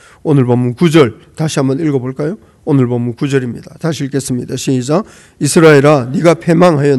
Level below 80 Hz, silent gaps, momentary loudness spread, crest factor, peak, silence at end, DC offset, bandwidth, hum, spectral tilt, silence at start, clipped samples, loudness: -50 dBFS; none; 12 LU; 12 dB; 0 dBFS; 0 s; under 0.1%; 12.5 kHz; none; -6 dB/octave; 0.25 s; 1%; -12 LUFS